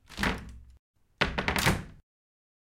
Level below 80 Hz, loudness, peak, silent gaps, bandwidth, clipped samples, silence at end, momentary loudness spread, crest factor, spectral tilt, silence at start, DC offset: -44 dBFS; -30 LUFS; -8 dBFS; 0.79-0.94 s; 16.5 kHz; under 0.1%; 0.75 s; 19 LU; 26 dB; -4 dB/octave; 0.1 s; under 0.1%